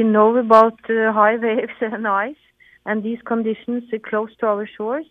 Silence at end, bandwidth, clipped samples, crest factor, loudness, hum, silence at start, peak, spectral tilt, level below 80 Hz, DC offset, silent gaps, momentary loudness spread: 0.1 s; 7.4 kHz; under 0.1%; 18 dB; -19 LUFS; none; 0 s; 0 dBFS; -7.5 dB/octave; -66 dBFS; under 0.1%; none; 13 LU